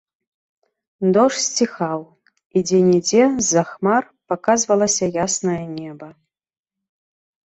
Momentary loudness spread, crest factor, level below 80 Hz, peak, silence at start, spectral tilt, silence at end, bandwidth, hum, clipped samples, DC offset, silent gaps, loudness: 11 LU; 18 dB; -58 dBFS; -2 dBFS; 1 s; -4 dB/octave; 1.45 s; 8.2 kHz; none; under 0.1%; under 0.1%; 2.45-2.50 s; -18 LUFS